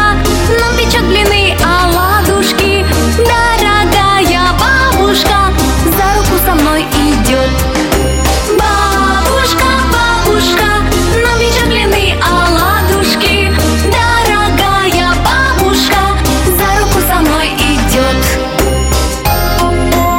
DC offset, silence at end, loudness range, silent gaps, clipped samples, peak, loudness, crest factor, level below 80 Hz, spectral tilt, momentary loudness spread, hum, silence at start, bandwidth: under 0.1%; 0 s; 1 LU; none; under 0.1%; 0 dBFS; -10 LUFS; 10 dB; -16 dBFS; -4 dB/octave; 3 LU; none; 0 s; 17 kHz